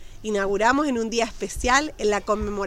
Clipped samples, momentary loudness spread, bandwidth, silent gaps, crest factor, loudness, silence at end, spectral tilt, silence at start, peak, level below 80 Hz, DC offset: under 0.1%; 7 LU; 15.5 kHz; none; 18 dB; -23 LUFS; 0 s; -3.5 dB/octave; 0 s; -4 dBFS; -38 dBFS; under 0.1%